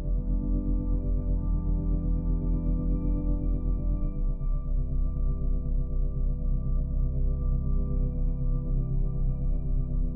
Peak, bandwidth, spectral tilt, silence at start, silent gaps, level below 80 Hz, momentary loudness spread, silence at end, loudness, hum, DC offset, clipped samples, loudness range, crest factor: -16 dBFS; 1.3 kHz; -14.5 dB/octave; 0 s; none; -26 dBFS; 2 LU; 0 s; -31 LUFS; none; 0.5%; under 0.1%; 2 LU; 10 dB